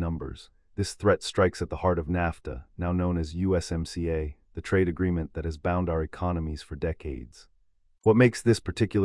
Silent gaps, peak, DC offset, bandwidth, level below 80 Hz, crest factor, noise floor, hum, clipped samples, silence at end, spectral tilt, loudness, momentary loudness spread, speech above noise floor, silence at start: none; -8 dBFS; under 0.1%; 12 kHz; -44 dBFS; 18 dB; -64 dBFS; none; under 0.1%; 0 s; -6.5 dB/octave; -27 LUFS; 13 LU; 38 dB; 0 s